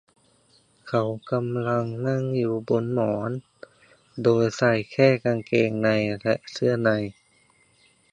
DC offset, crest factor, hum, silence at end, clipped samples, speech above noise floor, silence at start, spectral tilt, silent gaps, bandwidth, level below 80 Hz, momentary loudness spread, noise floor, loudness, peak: under 0.1%; 20 dB; none; 1 s; under 0.1%; 38 dB; 0.85 s; -7 dB/octave; none; 9.8 kHz; -62 dBFS; 7 LU; -61 dBFS; -24 LUFS; -4 dBFS